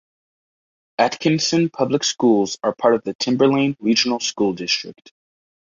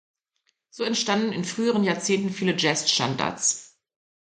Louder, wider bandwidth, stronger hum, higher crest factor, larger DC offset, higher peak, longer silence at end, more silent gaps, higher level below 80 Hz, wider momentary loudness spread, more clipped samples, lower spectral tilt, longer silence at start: first, -19 LUFS vs -24 LUFS; second, 7.6 kHz vs 9.6 kHz; neither; about the same, 18 dB vs 20 dB; neither; first, -2 dBFS vs -6 dBFS; first, 0.85 s vs 0.55 s; first, 3.15-3.19 s vs none; first, -62 dBFS vs -68 dBFS; about the same, 5 LU vs 5 LU; neither; about the same, -4 dB/octave vs -3 dB/octave; first, 1 s vs 0.75 s